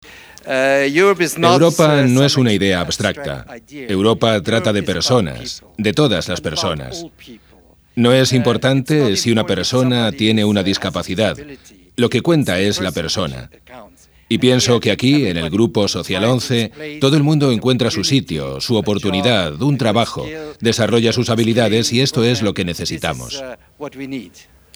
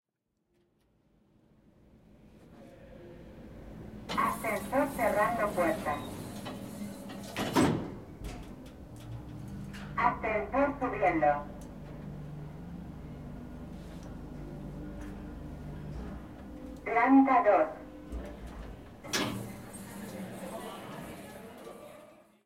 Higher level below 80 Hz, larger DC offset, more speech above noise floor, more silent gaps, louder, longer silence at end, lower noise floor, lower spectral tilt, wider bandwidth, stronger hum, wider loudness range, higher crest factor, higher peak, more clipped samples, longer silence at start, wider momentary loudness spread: first, -46 dBFS vs -52 dBFS; neither; second, 33 dB vs 51 dB; neither; first, -16 LUFS vs -32 LUFS; about the same, 0.35 s vs 0.25 s; second, -49 dBFS vs -80 dBFS; about the same, -5 dB/octave vs -5.5 dB/octave; first, over 20 kHz vs 16 kHz; neither; second, 4 LU vs 15 LU; second, 16 dB vs 24 dB; first, 0 dBFS vs -10 dBFS; neither; second, 0.05 s vs 1.95 s; second, 14 LU vs 20 LU